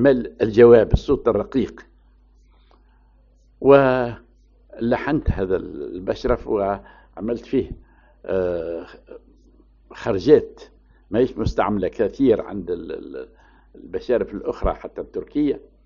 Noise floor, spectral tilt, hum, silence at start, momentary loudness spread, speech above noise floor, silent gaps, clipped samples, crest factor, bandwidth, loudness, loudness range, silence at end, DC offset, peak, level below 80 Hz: -54 dBFS; -6.5 dB/octave; none; 0 s; 18 LU; 34 dB; none; under 0.1%; 20 dB; 7 kHz; -20 LUFS; 7 LU; 0.25 s; under 0.1%; 0 dBFS; -38 dBFS